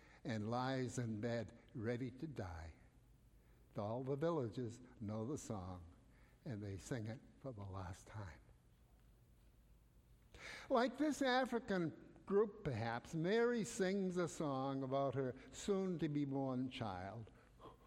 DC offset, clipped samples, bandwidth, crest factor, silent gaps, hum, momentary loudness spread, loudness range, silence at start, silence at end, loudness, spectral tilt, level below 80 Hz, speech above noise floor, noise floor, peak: under 0.1%; under 0.1%; 16 kHz; 20 dB; none; none; 15 LU; 12 LU; 0 s; 0 s; -43 LUFS; -6 dB/octave; -68 dBFS; 27 dB; -69 dBFS; -24 dBFS